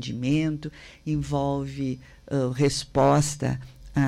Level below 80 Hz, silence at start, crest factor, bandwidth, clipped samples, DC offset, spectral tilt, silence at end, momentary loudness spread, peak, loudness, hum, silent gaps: -46 dBFS; 0 s; 16 dB; 13 kHz; under 0.1%; under 0.1%; -6 dB/octave; 0 s; 14 LU; -10 dBFS; -26 LUFS; none; none